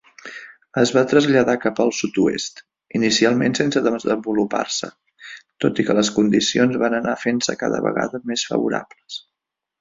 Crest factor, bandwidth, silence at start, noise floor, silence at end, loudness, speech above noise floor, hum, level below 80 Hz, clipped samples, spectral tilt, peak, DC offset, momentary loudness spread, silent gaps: 18 dB; 7.8 kHz; 0.25 s; -84 dBFS; 0.6 s; -19 LUFS; 64 dB; none; -58 dBFS; under 0.1%; -4 dB/octave; -2 dBFS; under 0.1%; 18 LU; none